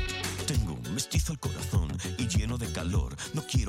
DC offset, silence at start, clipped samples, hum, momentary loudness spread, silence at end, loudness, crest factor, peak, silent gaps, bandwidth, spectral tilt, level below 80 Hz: under 0.1%; 0 s; under 0.1%; none; 4 LU; 0 s; -31 LUFS; 14 dB; -16 dBFS; none; 16.5 kHz; -4.5 dB/octave; -36 dBFS